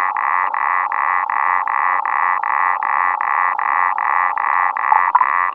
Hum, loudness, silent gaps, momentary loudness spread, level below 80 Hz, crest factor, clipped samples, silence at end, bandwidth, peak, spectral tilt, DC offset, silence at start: none; -16 LUFS; none; 3 LU; -78 dBFS; 16 dB; under 0.1%; 0 s; 4.2 kHz; 0 dBFS; -4 dB/octave; under 0.1%; 0 s